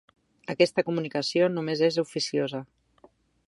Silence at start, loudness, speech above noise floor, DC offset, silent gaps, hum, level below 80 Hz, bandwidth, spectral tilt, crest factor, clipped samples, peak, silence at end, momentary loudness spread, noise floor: 0.5 s; -26 LUFS; 34 dB; under 0.1%; none; none; -72 dBFS; 11.5 kHz; -5 dB/octave; 20 dB; under 0.1%; -8 dBFS; 0.85 s; 12 LU; -60 dBFS